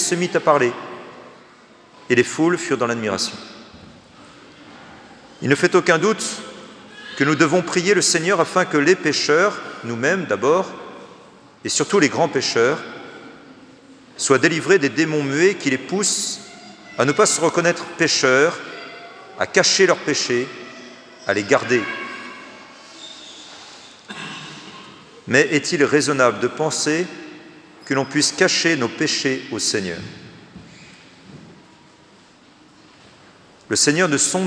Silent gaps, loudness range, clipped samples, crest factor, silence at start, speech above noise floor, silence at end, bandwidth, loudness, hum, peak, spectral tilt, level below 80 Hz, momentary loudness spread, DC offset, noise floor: none; 7 LU; under 0.1%; 20 dB; 0 s; 31 dB; 0 s; 10.5 kHz; -18 LUFS; none; 0 dBFS; -3 dB/octave; -68 dBFS; 22 LU; under 0.1%; -50 dBFS